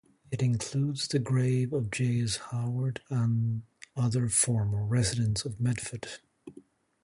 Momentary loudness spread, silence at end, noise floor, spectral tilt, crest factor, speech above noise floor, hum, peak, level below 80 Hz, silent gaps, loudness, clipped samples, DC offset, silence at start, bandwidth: 12 LU; 0.45 s; -56 dBFS; -5 dB/octave; 18 dB; 28 dB; none; -12 dBFS; -54 dBFS; none; -29 LUFS; under 0.1%; under 0.1%; 0.3 s; 11.5 kHz